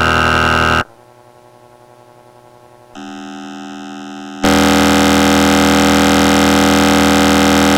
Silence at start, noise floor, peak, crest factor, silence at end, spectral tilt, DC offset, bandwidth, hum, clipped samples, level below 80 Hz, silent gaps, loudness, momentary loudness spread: 0 s; -43 dBFS; 0 dBFS; 12 dB; 0 s; -4 dB/octave; under 0.1%; 17 kHz; none; under 0.1%; -32 dBFS; none; -11 LUFS; 19 LU